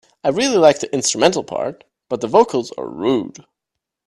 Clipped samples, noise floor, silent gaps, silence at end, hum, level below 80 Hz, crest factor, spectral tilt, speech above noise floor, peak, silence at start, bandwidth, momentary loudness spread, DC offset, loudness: under 0.1%; -82 dBFS; none; 0.8 s; none; -58 dBFS; 18 dB; -3.5 dB/octave; 65 dB; 0 dBFS; 0.25 s; 12.5 kHz; 14 LU; under 0.1%; -17 LUFS